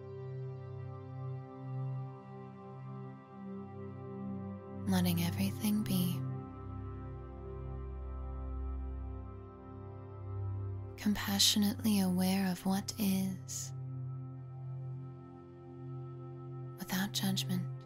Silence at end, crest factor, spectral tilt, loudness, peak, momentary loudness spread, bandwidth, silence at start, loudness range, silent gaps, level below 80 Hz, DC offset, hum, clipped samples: 0 s; 22 dB; -4.5 dB/octave; -37 LUFS; -14 dBFS; 17 LU; 16 kHz; 0 s; 13 LU; none; -52 dBFS; under 0.1%; none; under 0.1%